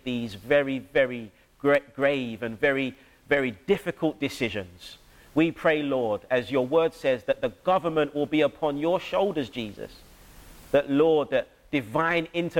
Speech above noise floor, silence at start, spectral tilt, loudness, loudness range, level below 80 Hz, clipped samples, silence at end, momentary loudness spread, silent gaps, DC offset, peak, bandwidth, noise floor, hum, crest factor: 24 dB; 0.05 s; -6 dB/octave; -26 LUFS; 2 LU; -56 dBFS; under 0.1%; 0 s; 10 LU; none; under 0.1%; -10 dBFS; 16.5 kHz; -49 dBFS; none; 16 dB